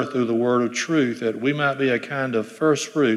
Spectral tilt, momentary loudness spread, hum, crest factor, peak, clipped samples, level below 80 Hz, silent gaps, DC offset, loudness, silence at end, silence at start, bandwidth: -5 dB/octave; 4 LU; none; 14 dB; -8 dBFS; under 0.1%; -72 dBFS; none; under 0.1%; -22 LUFS; 0 s; 0 s; 13 kHz